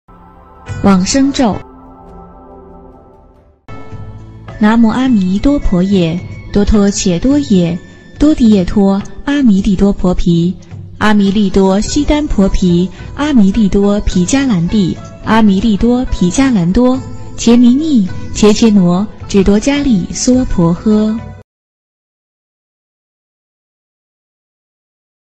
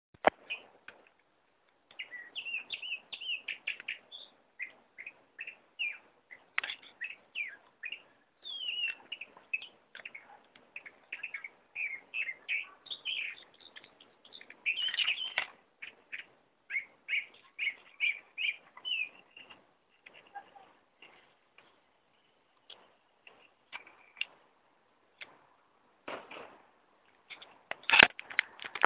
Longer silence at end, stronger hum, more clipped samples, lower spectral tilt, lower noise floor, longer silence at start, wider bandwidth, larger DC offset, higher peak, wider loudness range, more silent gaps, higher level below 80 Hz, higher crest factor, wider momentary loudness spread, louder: first, 3.95 s vs 0 s; neither; neither; first, -6 dB/octave vs 2 dB/octave; second, -44 dBFS vs -72 dBFS; first, 0.65 s vs 0.25 s; first, 8.6 kHz vs 4 kHz; neither; about the same, 0 dBFS vs 0 dBFS; second, 6 LU vs 13 LU; neither; first, -24 dBFS vs -74 dBFS; second, 12 dB vs 38 dB; second, 10 LU vs 21 LU; first, -11 LUFS vs -34 LUFS